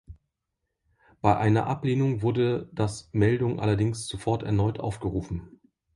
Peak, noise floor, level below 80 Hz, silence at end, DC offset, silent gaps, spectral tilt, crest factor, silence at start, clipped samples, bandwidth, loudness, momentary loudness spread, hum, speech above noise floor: -6 dBFS; -82 dBFS; -48 dBFS; 0.45 s; under 0.1%; none; -7 dB/octave; 20 dB; 0.1 s; under 0.1%; 11.5 kHz; -26 LUFS; 8 LU; none; 57 dB